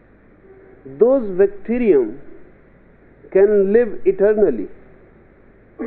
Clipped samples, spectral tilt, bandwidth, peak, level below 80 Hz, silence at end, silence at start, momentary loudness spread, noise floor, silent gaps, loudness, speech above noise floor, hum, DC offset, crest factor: under 0.1%; -8.5 dB/octave; 3.5 kHz; -2 dBFS; -44 dBFS; 0 s; 0.85 s; 6 LU; -48 dBFS; none; -17 LUFS; 33 dB; none; under 0.1%; 16 dB